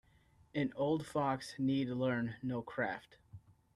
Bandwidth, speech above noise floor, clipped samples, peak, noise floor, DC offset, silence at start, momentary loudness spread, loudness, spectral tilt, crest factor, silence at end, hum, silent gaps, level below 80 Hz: 12.5 kHz; 31 dB; under 0.1%; -22 dBFS; -68 dBFS; under 0.1%; 0.55 s; 6 LU; -37 LUFS; -7 dB/octave; 16 dB; 0.35 s; none; none; -70 dBFS